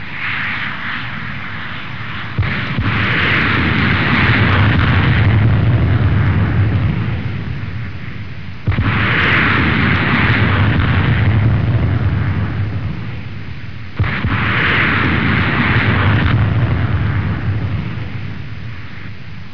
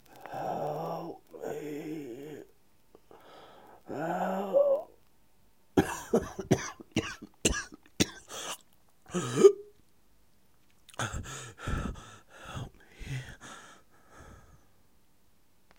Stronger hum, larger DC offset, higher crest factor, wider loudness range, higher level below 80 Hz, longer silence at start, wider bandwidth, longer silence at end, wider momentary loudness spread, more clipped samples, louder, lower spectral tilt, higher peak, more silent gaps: neither; first, 4% vs under 0.1%; second, 14 dB vs 28 dB; second, 5 LU vs 13 LU; first, -28 dBFS vs -52 dBFS; about the same, 0 s vs 0.1 s; second, 5.4 kHz vs 16 kHz; second, 0 s vs 1.4 s; second, 15 LU vs 22 LU; neither; first, -15 LUFS vs -32 LUFS; first, -8 dB/octave vs -4.5 dB/octave; first, 0 dBFS vs -6 dBFS; neither